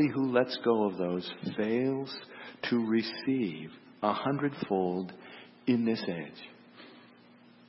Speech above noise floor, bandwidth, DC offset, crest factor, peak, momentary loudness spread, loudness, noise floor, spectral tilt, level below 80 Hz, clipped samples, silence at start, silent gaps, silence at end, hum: 27 dB; 6 kHz; under 0.1%; 20 dB; -12 dBFS; 20 LU; -31 LUFS; -57 dBFS; -9.5 dB/octave; -76 dBFS; under 0.1%; 0 s; none; 0.7 s; none